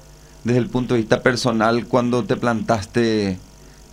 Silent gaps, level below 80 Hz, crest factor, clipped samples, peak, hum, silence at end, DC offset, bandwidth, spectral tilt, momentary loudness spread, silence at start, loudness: none; -46 dBFS; 18 dB; under 0.1%; -2 dBFS; none; 0.5 s; under 0.1%; 14 kHz; -6 dB/octave; 4 LU; 0.45 s; -20 LUFS